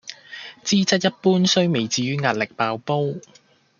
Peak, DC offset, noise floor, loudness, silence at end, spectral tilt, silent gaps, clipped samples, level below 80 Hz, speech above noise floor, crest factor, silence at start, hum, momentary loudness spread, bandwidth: -2 dBFS; under 0.1%; -40 dBFS; -21 LUFS; 0.6 s; -4.5 dB/octave; none; under 0.1%; -66 dBFS; 19 dB; 20 dB; 0.05 s; none; 18 LU; 7.4 kHz